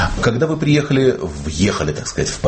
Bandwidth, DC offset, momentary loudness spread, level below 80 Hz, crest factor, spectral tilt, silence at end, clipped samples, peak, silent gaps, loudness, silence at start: 8.8 kHz; under 0.1%; 6 LU; -32 dBFS; 14 dB; -5.5 dB/octave; 0 s; under 0.1%; -4 dBFS; none; -17 LUFS; 0 s